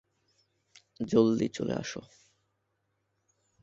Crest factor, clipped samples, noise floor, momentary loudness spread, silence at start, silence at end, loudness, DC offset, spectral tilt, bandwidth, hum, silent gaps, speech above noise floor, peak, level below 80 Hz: 24 dB; under 0.1%; -79 dBFS; 15 LU; 1 s; 1.55 s; -29 LUFS; under 0.1%; -6 dB/octave; 7.8 kHz; none; none; 50 dB; -10 dBFS; -66 dBFS